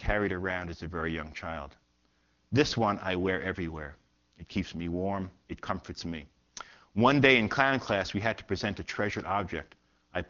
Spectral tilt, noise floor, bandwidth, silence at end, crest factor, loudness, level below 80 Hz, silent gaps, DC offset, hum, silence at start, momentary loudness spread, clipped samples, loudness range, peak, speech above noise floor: -4 dB/octave; -71 dBFS; 7.4 kHz; 0.05 s; 26 dB; -30 LUFS; -50 dBFS; none; under 0.1%; none; 0 s; 17 LU; under 0.1%; 8 LU; -6 dBFS; 41 dB